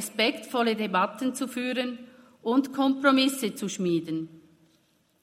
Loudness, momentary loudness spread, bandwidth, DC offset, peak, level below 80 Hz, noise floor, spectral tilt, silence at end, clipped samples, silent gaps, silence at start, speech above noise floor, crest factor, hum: -27 LUFS; 13 LU; 16 kHz; under 0.1%; -8 dBFS; -78 dBFS; -67 dBFS; -4 dB/octave; 0.8 s; under 0.1%; none; 0 s; 40 dB; 20 dB; none